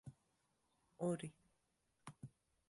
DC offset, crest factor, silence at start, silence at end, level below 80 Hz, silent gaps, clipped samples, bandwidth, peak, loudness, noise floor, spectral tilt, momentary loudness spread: under 0.1%; 22 dB; 0.05 s; 0.4 s; -80 dBFS; none; under 0.1%; 11.5 kHz; -30 dBFS; -47 LUFS; -84 dBFS; -6.5 dB/octave; 18 LU